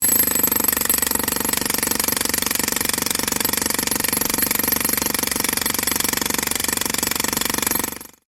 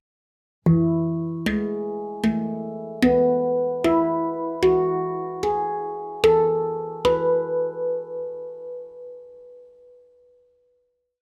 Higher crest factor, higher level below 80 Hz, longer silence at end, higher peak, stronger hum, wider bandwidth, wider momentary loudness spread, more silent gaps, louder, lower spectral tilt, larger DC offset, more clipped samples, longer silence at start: about the same, 18 dB vs 18 dB; first, -44 dBFS vs -50 dBFS; second, 0.25 s vs 1.55 s; about the same, -2 dBFS vs -4 dBFS; neither; first, over 20 kHz vs 13.5 kHz; second, 3 LU vs 14 LU; neither; first, -18 LUFS vs -23 LUFS; second, -1 dB/octave vs -7.5 dB/octave; neither; neither; second, 0 s vs 0.65 s